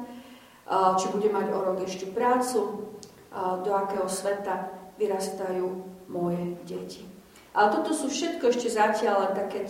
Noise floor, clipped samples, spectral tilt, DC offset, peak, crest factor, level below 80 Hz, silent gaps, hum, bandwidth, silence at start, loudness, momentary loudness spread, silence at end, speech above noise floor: -49 dBFS; under 0.1%; -4.5 dB/octave; under 0.1%; -8 dBFS; 20 dB; -68 dBFS; none; none; 16 kHz; 0 s; -27 LUFS; 16 LU; 0 s; 22 dB